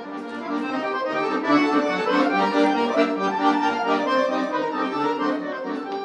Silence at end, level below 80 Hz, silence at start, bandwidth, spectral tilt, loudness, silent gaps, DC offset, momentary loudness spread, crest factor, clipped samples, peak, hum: 0 s; -84 dBFS; 0 s; 9.4 kHz; -5 dB/octave; -22 LUFS; none; under 0.1%; 8 LU; 16 dB; under 0.1%; -6 dBFS; none